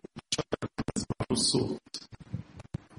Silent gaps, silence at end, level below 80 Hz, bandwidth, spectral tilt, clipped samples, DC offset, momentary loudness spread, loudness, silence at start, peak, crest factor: none; 0.05 s; -54 dBFS; 11.5 kHz; -4 dB/octave; under 0.1%; under 0.1%; 17 LU; -31 LUFS; 0.15 s; -14 dBFS; 20 dB